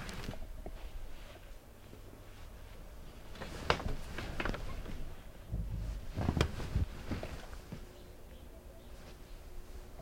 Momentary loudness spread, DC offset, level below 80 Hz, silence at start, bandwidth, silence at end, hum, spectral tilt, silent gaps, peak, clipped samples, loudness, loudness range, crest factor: 19 LU; under 0.1%; -44 dBFS; 0 s; 16.5 kHz; 0 s; none; -5.5 dB/octave; none; -12 dBFS; under 0.1%; -41 LUFS; 10 LU; 30 dB